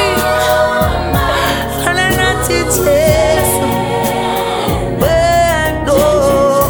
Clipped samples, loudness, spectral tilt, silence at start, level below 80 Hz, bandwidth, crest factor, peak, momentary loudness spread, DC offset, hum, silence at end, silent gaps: under 0.1%; -12 LUFS; -4 dB/octave; 0 s; -26 dBFS; over 20 kHz; 12 dB; 0 dBFS; 5 LU; under 0.1%; none; 0 s; none